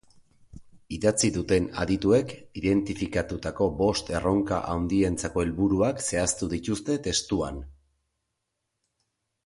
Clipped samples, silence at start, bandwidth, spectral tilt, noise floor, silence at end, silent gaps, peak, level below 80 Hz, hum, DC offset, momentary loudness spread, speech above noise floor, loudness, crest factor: under 0.1%; 0.55 s; 11.5 kHz; -5 dB/octave; -81 dBFS; 1.75 s; none; -10 dBFS; -44 dBFS; none; under 0.1%; 6 LU; 55 dB; -26 LUFS; 18 dB